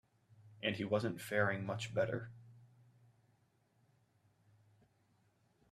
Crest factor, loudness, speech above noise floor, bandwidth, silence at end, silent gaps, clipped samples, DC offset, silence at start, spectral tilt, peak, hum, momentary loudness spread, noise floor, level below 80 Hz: 22 dB; -38 LUFS; 38 dB; 13 kHz; 3.05 s; none; under 0.1%; under 0.1%; 0.4 s; -5.5 dB/octave; -20 dBFS; none; 6 LU; -75 dBFS; -76 dBFS